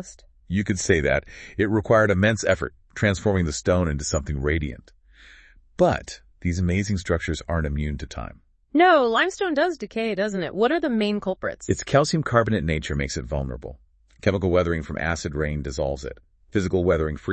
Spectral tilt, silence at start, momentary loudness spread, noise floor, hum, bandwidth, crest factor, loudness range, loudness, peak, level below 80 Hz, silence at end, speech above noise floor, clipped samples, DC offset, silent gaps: -5.5 dB/octave; 0 s; 11 LU; -51 dBFS; none; 8.8 kHz; 20 dB; 4 LU; -23 LUFS; -4 dBFS; -40 dBFS; 0 s; 28 dB; under 0.1%; under 0.1%; none